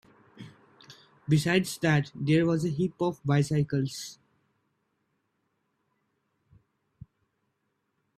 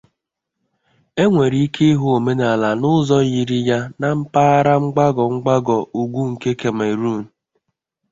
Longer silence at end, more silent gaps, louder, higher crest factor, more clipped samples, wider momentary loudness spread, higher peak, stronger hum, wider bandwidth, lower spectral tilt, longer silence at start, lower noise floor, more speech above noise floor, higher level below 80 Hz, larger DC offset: first, 4.05 s vs 0.85 s; neither; second, -27 LUFS vs -17 LUFS; first, 20 dB vs 14 dB; neither; first, 10 LU vs 7 LU; second, -10 dBFS vs -2 dBFS; neither; first, 14 kHz vs 7.8 kHz; about the same, -6 dB/octave vs -7 dB/octave; second, 0.4 s vs 1.15 s; about the same, -78 dBFS vs -79 dBFS; second, 51 dB vs 63 dB; second, -64 dBFS vs -54 dBFS; neither